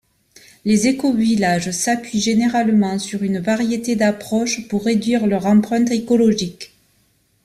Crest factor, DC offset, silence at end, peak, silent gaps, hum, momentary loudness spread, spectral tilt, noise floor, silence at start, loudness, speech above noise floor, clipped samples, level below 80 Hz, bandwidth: 14 dB; under 0.1%; 0.8 s; -4 dBFS; none; none; 6 LU; -5 dB/octave; -61 dBFS; 0.65 s; -18 LUFS; 44 dB; under 0.1%; -54 dBFS; 14 kHz